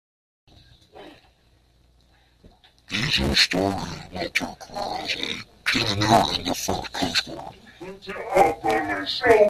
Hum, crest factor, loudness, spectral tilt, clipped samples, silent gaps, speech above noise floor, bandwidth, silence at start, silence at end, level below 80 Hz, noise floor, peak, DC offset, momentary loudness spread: none; 22 dB; -23 LUFS; -3.5 dB/octave; under 0.1%; none; 37 dB; 15 kHz; 0.95 s; 0 s; -46 dBFS; -60 dBFS; -4 dBFS; under 0.1%; 16 LU